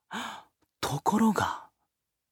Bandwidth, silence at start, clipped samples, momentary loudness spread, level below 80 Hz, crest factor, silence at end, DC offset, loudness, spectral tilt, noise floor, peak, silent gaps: 17.5 kHz; 0.1 s; under 0.1%; 16 LU; -62 dBFS; 18 dB; 0.65 s; under 0.1%; -29 LUFS; -5 dB/octave; -82 dBFS; -12 dBFS; none